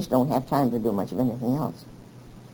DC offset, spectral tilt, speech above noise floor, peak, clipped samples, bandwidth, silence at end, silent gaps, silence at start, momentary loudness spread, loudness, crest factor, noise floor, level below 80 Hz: under 0.1%; -8 dB/octave; 21 dB; -8 dBFS; under 0.1%; over 20 kHz; 0.05 s; none; 0 s; 12 LU; -25 LUFS; 18 dB; -46 dBFS; -54 dBFS